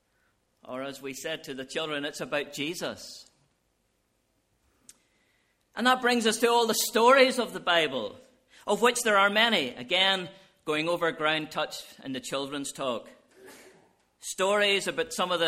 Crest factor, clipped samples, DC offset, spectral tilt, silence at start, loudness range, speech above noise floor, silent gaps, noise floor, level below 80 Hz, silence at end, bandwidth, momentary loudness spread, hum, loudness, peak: 22 dB; under 0.1%; under 0.1%; -2 dB/octave; 0.65 s; 12 LU; 46 dB; none; -73 dBFS; -72 dBFS; 0 s; 16 kHz; 16 LU; none; -26 LUFS; -8 dBFS